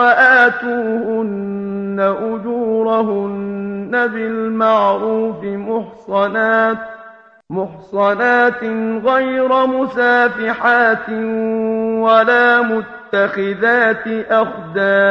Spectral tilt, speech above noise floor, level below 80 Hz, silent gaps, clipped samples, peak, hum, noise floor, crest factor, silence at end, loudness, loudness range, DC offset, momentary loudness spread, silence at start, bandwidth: -7 dB/octave; 25 dB; -58 dBFS; none; under 0.1%; 0 dBFS; none; -40 dBFS; 16 dB; 0 s; -15 LUFS; 5 LU; under 0.1%; 11 LU; 0 s; 6.8 kHz